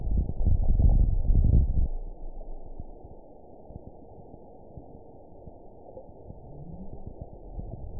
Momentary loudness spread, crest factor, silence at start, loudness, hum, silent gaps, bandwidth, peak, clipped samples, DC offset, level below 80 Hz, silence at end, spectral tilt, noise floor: 25 LU; 18 dB; 0 s; -27 LUFS; none; none; 1 kHz; -10 dBFS; under 0.1%; 0.3%; -28 dBFS; 0 s; -17.5 dB/octave; -49 dBFS